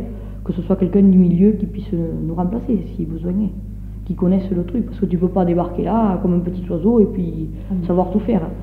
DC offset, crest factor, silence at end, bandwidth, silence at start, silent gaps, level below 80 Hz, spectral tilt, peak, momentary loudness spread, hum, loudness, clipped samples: under 0.1%; 16 dB; 0 s; 4.1 kHz; 0 s; none; -32 dBFS; -11.5 dB/octave; -2 dBFS; 12 LU; none; -18 LUFS; under 0.1%